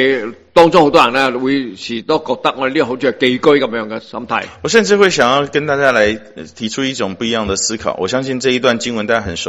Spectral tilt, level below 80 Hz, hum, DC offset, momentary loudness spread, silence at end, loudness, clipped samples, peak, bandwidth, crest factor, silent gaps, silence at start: -3.5 dB/octave; -48 dBFS; none; under 0.1%; 10 LU; 0 s; -14 LUFS; 0.4%; 0 dBFS; 12 kHz; 14 dB; none; 0 s